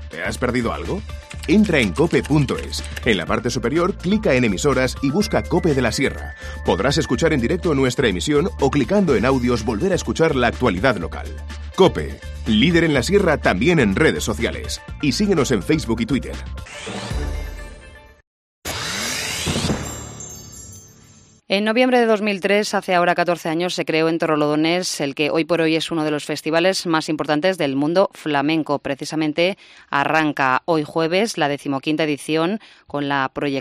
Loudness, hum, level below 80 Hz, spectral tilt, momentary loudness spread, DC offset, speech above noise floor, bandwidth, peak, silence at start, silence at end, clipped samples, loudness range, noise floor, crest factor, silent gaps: -19 LUFS; none; -36 dBFS; -5 dB/octave; 13 LU; under 0.1%; 30 dB; 15 kHz; -2 dBFS; 0 s; 0 s; under 0.1%; 7 LU; -49 dBFS; 18 dB; 18.27-18.62 s